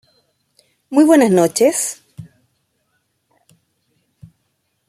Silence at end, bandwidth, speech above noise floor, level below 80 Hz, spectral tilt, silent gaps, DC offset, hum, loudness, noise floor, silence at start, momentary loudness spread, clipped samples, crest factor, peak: 2.65 s; 15.5 kHz; 56 dB; -64 dBFS; -4.5 dB/octave; none; under 0.1%; none; -14 LUFS; -69 dBFS; 0.9 s; 12 LU; under 0.1%; 18 dB; 0 dBFS